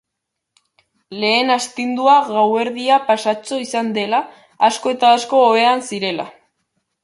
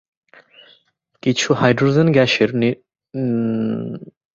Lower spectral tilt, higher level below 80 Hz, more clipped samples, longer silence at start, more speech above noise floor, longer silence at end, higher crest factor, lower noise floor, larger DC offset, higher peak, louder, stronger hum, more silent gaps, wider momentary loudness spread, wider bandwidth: second, -3 dB/octave vs -5.5 dB/octave; second, -70 dBFS vs -56 dBFS; neither; second, 1.1 s vs 1.25 s; first, 63 dB vs 43 dB; first, 0.75 s vs 0.3 s; about the same, 16 dB vs 18 dB; first, -79 dBFS vs -60 dBFS; neither; about the same, -2 dBFS vs -2 dBFS; about the same, -16 LUFS vs -18 LUFS; neither; neither; second, 9 LU vs 16 LU; first, 11.5 kHz vs 7.8 kHz